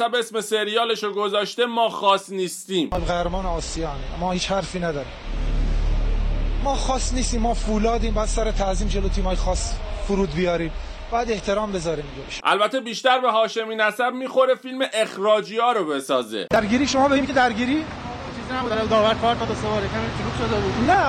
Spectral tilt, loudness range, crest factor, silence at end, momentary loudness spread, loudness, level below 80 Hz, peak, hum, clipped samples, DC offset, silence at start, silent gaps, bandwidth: -4.5 dB/octave; 5 LU; 18 dB; 0 s; 9 LU; -23 LUFS; -28 dBFS; -4 dBFS; none; under 0.1%; under 0.1%; 0 s; none; 13.5 kHz